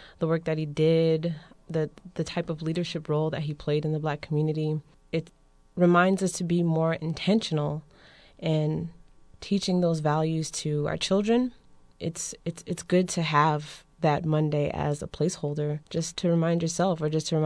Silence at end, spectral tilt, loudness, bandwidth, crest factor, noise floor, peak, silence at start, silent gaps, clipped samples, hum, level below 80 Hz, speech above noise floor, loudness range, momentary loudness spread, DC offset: 0 s; -6 dB/octave; -27 LUFS; 11 kHz; 18 dB; -54 dBFS; -8 dBFS; 0 s; none; under 0.1%; none; -56 dBFS; 28 dB; 3 LU; 10 LU; under 0.1%